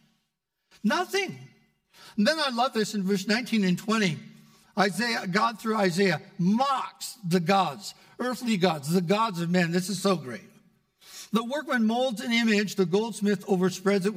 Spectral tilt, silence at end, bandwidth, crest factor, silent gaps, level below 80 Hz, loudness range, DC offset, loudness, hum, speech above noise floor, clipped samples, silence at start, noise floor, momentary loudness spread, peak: -5 dB/octave; 0 s; 16 kHz; 18 dB; none; -78 dBFS; 2 LU; under 0.1%; -26 LUFS; none; 54 dB; under 0.1%; 0.85 s; -80 dBFS; 11 LU; -8 dBFS